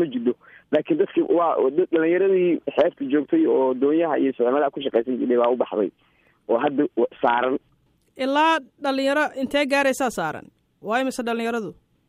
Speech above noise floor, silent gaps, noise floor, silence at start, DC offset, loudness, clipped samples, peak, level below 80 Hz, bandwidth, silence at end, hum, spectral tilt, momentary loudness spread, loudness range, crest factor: 37 dB; none; -58 dBFS; 0 s; under 0.1%; -22 LUFS; under 0.1%; -6 dBFS; -66 dBFS; 15 kHz; 0.35 s; none; -5 dB/octave; 8 LU; 3 LU; 16 dB